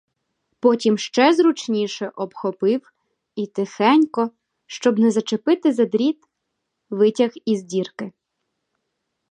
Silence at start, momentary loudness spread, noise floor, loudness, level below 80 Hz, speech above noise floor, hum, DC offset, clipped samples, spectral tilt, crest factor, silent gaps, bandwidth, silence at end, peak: 0.65 s; 14 LU; -77 dBFS; -20 LUFS; -76 dBFS; 58 dB; none; under 0.1%; under 0.1%; -5 dB/octave; 20 dB; none; 9.8 kHz; 1.2 s; -2 dBFS